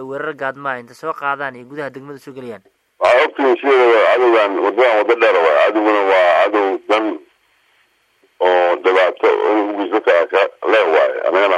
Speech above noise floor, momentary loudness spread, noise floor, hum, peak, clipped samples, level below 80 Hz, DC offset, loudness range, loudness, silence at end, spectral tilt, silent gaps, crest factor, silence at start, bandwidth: 44 dB; 16 LU; -59 dBFS; none; -2 dBFS; under 0.1%; -70 dBFS; under 0.1%; 5 LU; -14 LUFS; 0 s; -4.5 dB/octave; none; 12 dB; 0 s; 10 kHz